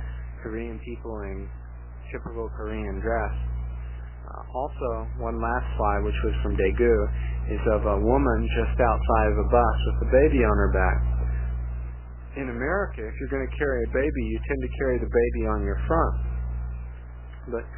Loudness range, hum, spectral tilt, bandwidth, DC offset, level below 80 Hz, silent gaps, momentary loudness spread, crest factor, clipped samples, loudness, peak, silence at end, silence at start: 10 LU; 60 Hz at -30 dBFS; -11.5 dB/octave; 3.2 kHz; 0.2%; -28 dBFS; none; 16 LU; 18 dB; under 0.1%; -26 LUFS; -6 dBFS; 0 s; 0 s